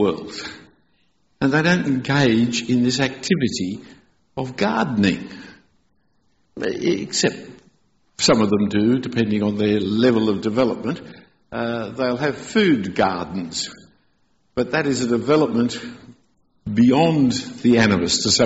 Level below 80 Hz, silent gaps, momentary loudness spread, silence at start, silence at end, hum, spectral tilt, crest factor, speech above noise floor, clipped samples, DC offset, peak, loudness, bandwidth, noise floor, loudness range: -52 dBFS; none; 13 LU; 0 s; 0 s; none; -5 dB/octave; 16 dB; 47 dB; under 0.1%; under 0.1%; -4 dBFS; -20 LUFS; 8.2 kHz; -66 dBFS; 5 LU